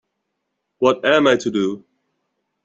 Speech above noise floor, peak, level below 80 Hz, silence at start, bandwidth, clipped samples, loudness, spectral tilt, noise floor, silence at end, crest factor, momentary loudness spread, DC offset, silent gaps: 59 dB; -2 dBFS; -62 dBFS; 0.8 s; 8.2 kHz; under 0.1%; -17 LUFS; -4.5 dB/octave; -76 dBFS; 0.85 s; 18 dB; 9 LU; under 0.1%; none